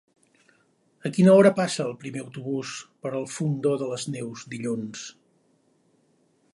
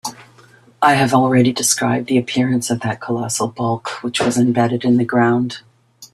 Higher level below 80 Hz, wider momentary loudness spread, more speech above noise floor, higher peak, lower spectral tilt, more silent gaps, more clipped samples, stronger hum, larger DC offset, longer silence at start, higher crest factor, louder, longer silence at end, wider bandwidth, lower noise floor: second, -72 dBFS vs -56 dBFS; first, 18 LU vs 9 LU; first, 42 dB vs 32 dB; second, -6 dBFS vs 0 dBFS; first, -6 dB/octave vs -4.5 dB/octave; neither; neither; neither; neither; first, 1.05 s vs 0.05 s; about the same, 20 dB vs 16 dB; second, -25 LUFS vs -17 LUFS; first, 1.4 s vs 0.1 s; second, 11.5 kHz vs 14 kHz; first, -66 dBFS vs -48 dBFS